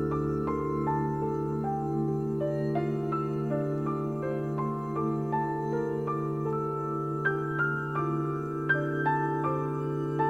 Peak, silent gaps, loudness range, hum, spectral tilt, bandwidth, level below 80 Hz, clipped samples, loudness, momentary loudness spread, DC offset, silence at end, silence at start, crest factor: -14 dBFS; none; 2 LU; none; -9 dB/octave; 7.6 kHz; -54 dBFS; under 0.1%; -30 LUFS; 3 LU; under 0.1%; 0 s; 0 s; 16 dB